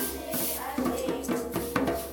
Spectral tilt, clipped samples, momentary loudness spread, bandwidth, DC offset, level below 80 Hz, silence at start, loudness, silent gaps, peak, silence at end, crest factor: -4 dB/octave; under 0.1%; 2 LU; over 20 kHz; under 0.1%; -48 dBFS; 0 s; -30 LUFS; none; -10 dBFS; 0 s; 20 dB